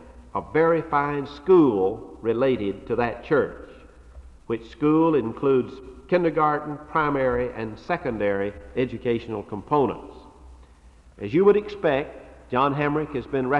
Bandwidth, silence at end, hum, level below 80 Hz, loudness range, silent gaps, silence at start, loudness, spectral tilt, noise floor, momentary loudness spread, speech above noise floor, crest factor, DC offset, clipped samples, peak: 7 kHz; 0 s; none; -48 dBFS; 4 LU; none; 0 s; -24 LUFS; -8.5 dB/octave; -51 dBFS; 13 LU; 28 dB; 16 dB; under 0.1%; under 0.1%; -6 dBFS